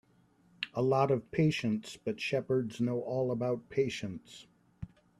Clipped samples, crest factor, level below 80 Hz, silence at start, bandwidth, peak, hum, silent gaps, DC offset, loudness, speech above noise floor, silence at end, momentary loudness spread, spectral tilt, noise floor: under 0.1%; 20 dB; -66 dBFS; 0.6 s; 13 kHz; -14 dBFS; none; none; under 0.1%; -33 LUFS; 35 dB; 0.35 s; 20 LU; -6.5 dB/octave; -67 dBFS